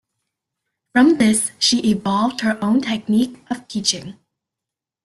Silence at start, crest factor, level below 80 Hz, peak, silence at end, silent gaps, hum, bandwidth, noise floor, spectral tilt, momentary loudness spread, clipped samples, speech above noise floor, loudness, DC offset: 0.95 s; 18 dB; -58 dBFS; -2 dBFS; 0.95 s; none; none; 12.5 kHz; -86 dBFS; -3.5 dB/octave; 11 LU; under 0.1%; 68 dB; -18 LUFS; under 0.1%